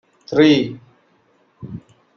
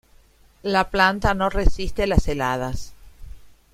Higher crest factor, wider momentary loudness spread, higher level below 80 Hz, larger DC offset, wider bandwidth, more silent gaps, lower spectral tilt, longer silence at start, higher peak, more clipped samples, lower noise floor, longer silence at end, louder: about the same, 18 dB vs 20 dB; first, 26 LU vs 13 LU; second, -58 dBFS vs -28 dBFS; neither; second, 6.6 kHz vs 15 kHz; neither; about the same, -6.5 dB/octave vs -5.5 dB/octave; second, 0.3 s vs 0.65 s; about the same, -2 dBFS vs -2 dBFS; neither; first, -59 dBFS vs -53 dBFS; first, 0.4 s vs 0.25 s; first, -16 LUFS vs -22 LUFS